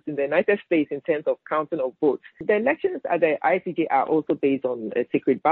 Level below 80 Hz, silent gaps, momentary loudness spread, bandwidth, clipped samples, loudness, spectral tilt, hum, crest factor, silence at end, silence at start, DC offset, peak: -70 dBFS; none; 5 LU; 4.2 kHz; under 0.1%; -23 LUFS; -4.5 dB/octave; none; 16 dB; 0 s; 0.05 s; under 0.1%; -6 dBFS